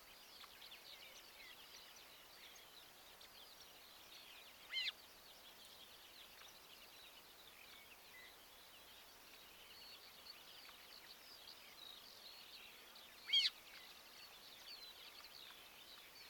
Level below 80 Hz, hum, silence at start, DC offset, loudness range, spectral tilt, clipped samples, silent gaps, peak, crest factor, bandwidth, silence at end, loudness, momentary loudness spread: -82 dBFS; none; 0 s; under 0.1%; 14 LU; 0.5 dB/octave; under 0.1%; none; -26 dBFS; 28 dB; 19 kHz; 0 s; -50 LUFS; 14 LU